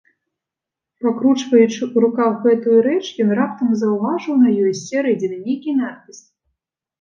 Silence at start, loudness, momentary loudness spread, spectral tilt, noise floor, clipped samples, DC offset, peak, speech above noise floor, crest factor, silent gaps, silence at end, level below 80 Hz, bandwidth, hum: 1 s; -17 LUFS; 8 LU; -6 dB/octave; -86 dBFS; under 0.1%; under 0.1%; -2 dBFS; 69 dB; 16 dB; none; 0.85 s; -72 dBFS; 7.4 kHz; none